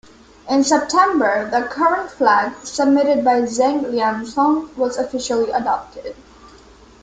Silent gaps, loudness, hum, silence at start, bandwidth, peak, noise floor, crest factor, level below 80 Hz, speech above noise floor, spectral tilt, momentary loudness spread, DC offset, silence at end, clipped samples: none; -18 LUFS; none; 0.45 s; 9.4 kHz; -2 dBFS; -45 dBFS; 16 dB; -54 dBFS; 28 dB; -3.5 dB/octave; 8 LU; under 0.1%; 0.9 s; under 0.1%